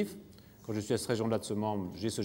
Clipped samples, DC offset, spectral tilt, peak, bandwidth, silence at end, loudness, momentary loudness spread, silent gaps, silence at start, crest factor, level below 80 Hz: under 0.1%; under 0.1%; -5.5 dB/octave; -18 dBFS; 16.5 kHz; 0 s; -34 LUFS; 17 LU; none; 0 s; 16 dB; -68 dBFS